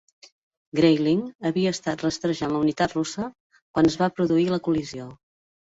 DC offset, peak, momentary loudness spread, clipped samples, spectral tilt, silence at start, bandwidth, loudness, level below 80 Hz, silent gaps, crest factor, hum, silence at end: under 0.1%; -6 dBFS; 12 LU; under 0.1%; -6 dB/octave; 0.75 s; 8 kHz; -24 LUFS; -56 dBFS; 1.35-1.39 s, 3.40-3.50 s, 3.62-3.74 s; 18 dB; none; 0.65 s